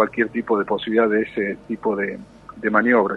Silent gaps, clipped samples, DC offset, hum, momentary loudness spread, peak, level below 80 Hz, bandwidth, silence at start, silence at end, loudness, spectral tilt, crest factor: none; under 0.1%; under 0.1%; none; 10 LU; -2 dBFS; -56 dBFS; 5.8 kHz; 0 s; 0 s; -21 LUFS; -7.5 dB/octave; 18 dB